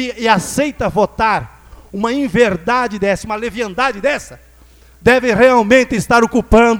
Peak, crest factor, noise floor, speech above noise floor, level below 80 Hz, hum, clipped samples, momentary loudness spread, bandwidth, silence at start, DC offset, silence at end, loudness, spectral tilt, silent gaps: 0 dBFS; 14 dB; -44 dBFS; 31 dB; -34 dBFS; none; under 0.1%; 10 LU; 19 kHz; 0 s; under 0.1%; 0 s; -14 LUFS; -5 dB/octave; none